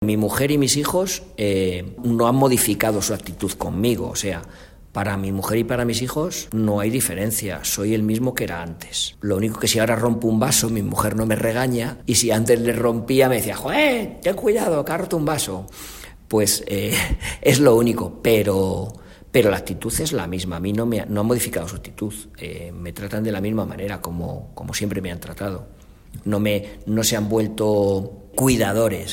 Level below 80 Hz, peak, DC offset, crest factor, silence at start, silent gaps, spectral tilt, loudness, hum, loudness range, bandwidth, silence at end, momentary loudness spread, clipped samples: -42 dBFS; 0 dBFS; under 0.1%; 20 dB; 0 s; none; -4.5 dB/octave; -21 LUFS; none; 7 LU; 16.5 kHz; 0 s; 12 LU; under 0.1%